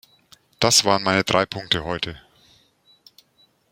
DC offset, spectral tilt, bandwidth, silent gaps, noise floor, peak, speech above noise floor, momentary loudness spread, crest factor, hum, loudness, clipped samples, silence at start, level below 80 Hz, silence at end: under 0.1%; -2.5 dB/octave; 16.5 kHz; none; -61 dBFS; 0 dBFS; 41 dB; 12 LU; 24 dB; none; -20 LUFS; under 0.1%; 0.6 s; -52 dBFS; 1.55 s